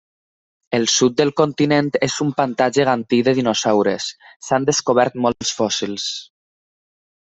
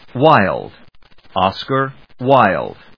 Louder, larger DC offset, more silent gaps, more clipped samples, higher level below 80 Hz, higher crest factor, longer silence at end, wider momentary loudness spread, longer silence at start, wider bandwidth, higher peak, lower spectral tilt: about the same, -18 LUFS vs -16 LUFS; second, under 0.1% vs 0.4%; first, 4.36-4.40 s vs none; second, under 0.1% vs 0.2%; second, -58 dBFS vs -52 dBFS; about the same, 16 dB vs 16 dB; first, 1.05 s vs 0.25 s; second, 8 LU vs 14 LU; first, 0.7 s vs 0.15 s; first, 8.4 kHz vs 5.4 kHz; about the same, -2 dBFS vs 0 dBFS; second, -4 dB/octave vs -8 dB/octave